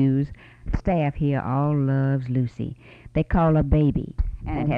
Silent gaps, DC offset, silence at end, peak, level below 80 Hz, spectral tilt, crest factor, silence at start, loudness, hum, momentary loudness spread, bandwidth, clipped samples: none; under 0.1%; 0 s; -8 dBFS; -32 dBFS; -10.5 dB/octave; 14 dB; 0 s; -24 LUFS; none; 12 LU; 4.9 kHz; under 0.1%